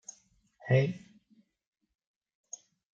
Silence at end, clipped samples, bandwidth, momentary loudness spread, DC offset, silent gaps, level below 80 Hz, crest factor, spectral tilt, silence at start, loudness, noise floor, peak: 2 s; under 0.1%; 7.6 kHz; 21 LU; under 0.1%; none; -74 dBFS; 22 dB; -6.5 dB/octave; 0.65 s; -29 LUFS; -68 dBFS; -14 dBFS